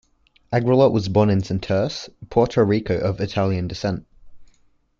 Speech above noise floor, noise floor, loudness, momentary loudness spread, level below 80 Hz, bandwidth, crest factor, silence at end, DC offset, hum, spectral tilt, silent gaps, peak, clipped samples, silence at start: 39 dB; -58 dBFS; -21 LUFS; 10 LU; -48 dBFS; 7.4 kHz; 16 dB; 0.55 s; under 0.1%; none; -7.5 dB/octave; none; -4 dBFS; under 0.1%; 0.5 s